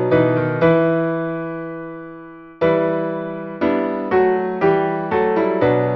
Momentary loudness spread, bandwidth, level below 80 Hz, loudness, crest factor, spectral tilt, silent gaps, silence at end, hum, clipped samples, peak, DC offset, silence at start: 14 LU; 5.8 kHz; -52 dBFS; -18 LUFS; 14 dB; -10 dB/octave; none; 0 s; none; under 0.1%; -4 dBFS; under 0.1%; 0 s